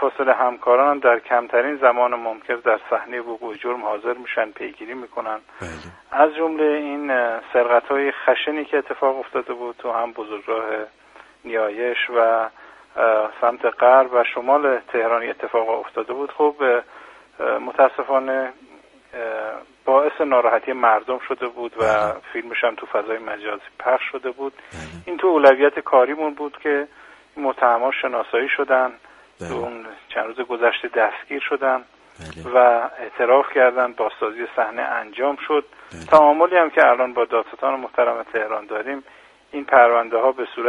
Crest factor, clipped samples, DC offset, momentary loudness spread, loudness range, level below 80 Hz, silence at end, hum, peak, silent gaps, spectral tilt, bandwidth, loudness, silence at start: 20 dB; under 0.1%; under 0.1%; 15 LU; 6 LU; -60 dBFS; 0 s; none; 0 dBFS; none; -5 dB/octave; 9.4 kHz; -20 LUFS; 0 s